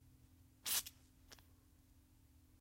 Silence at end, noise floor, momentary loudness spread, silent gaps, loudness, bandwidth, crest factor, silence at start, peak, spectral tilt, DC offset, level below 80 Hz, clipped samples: 1.2 s; -69 dBFS; 23 LU; none; -41 LUFS; 16.5 kHz; 28 dB; 0.65 s; -22 dBFS; 0.5 dB/octave; under 0.1%; -72 dBFS; under 0.1%